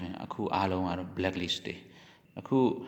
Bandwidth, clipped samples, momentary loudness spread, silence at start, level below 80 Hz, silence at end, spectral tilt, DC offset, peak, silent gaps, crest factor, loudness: 19 kHz; under 0.1%; 16 LU; 0 s; -68 dBFS; 0 s; -6 dB/octave; under 0.1%; -12 dBFS; none; 20 dB; -32 LUFS